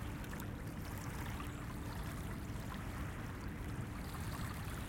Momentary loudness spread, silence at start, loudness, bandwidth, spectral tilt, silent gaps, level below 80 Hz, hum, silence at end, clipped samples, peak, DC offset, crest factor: 2 LU; 0 s; -45 LUFS; 17 kHz; -5.5 dB/octave; none; -50 dBFS; none; 0 s; under 0.1%; -28 dBFS; under 0.1%; 16 dB